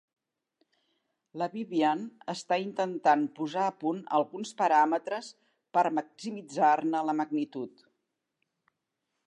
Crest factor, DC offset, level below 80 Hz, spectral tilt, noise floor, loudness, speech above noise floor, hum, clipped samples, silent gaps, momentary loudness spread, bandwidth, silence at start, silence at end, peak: 20 dB; under 0.1%; -88 dBFS; -5 dB/octave; -83 dBFS; -29 LUFS; 55 dB; none; under 0.1%; none; 13 LU; 11 kHz; 1.35 s; 1.6 s; -12 dBFS